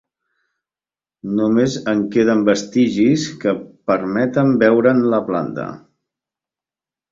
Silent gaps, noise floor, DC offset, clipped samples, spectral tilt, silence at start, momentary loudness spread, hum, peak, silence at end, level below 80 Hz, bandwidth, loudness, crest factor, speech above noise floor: none; under -90 dBFS; under 0.1%; under 0.1%; -6.5 dB/octave; 1.25 s; 10 LU; none; 0 dBFS; 1.35 s; -58 dBFS; 7.8 kHz; -17 LUFS; 18 dB; over 74 dB